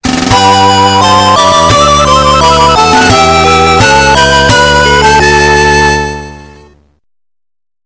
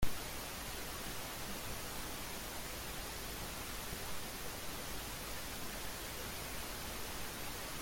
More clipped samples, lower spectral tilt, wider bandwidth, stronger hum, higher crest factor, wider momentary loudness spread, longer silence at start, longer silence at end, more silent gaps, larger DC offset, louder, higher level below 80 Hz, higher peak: first, 6% vs under 0.1%; about the same, -3.5 dB/octave vs -2.5 dB/octave; second, 8 kHz vs 17 kHz; neither; second, 6 dB vs 22 dB; about the same, 2 LU vs 0 LU; about the same, 0.05 s vs 0 s; first, 1.35 s vs 0 s; neither; neither; first, -5 LUFS vs -43 LUFS; first, -22 dBFS vs -52 dBFS; first, 0 dBFS vs -20 dBFS